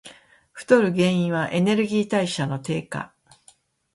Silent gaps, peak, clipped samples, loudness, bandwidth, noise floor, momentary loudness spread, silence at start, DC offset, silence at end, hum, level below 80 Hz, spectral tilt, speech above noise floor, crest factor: none; -4 dBFS; under 0.1%; -22 LUFS; 11.5 kHz; -58 dBFS; 14 LU; 0.05 s; under 0.1%; 0.9 s; none; -62 dBFS; -6 dB/octave; 36 dB; 20 dB